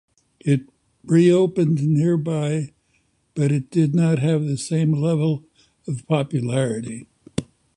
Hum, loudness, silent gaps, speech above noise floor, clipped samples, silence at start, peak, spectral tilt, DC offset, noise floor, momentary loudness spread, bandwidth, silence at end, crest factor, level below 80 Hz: none; -21 LUFS; none; 46 dB; under 0.1%; 0.45 s; -4 dBFS; -7.5 dB/octave; under 0.1%; -65 dBFS; 14 LU; 11 kHz; 0.35 s; 16 dB; -56 dBFS